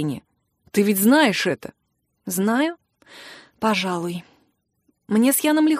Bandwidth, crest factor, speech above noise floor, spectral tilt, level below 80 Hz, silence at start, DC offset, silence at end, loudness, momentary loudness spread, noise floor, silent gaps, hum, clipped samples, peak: 15.5 kHz; 18 dB; 52 dB; -4 dB/octave; -66 dBFS; 0 s; under 0.1%; 0 s; -20 LUFS; 23 LU; -72 dBFS; none; none; under 0.1%; -4 dBFS